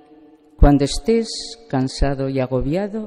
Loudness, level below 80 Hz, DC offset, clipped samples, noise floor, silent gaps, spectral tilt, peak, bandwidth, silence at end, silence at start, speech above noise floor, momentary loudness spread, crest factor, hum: -20 LUFS; -24 dBFS; under 0.1%; under 0.1%; -48 dBFS; none; -6 dB/octave; -2 dBFS; 12 kHz; 0 s; 0.6 s; 29 dB; 9 LU; 18 dB; none